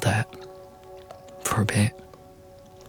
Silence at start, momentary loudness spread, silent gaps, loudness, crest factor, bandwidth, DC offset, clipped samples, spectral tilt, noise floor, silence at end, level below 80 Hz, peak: 0 s; 25 LU; none; -26 LUFS; 20 dB; 19 kHz; under 0.1%; under 0.1%; -5 dB/octave; -48 dBFS; 0 s; -56 dBFS; -8 dBFS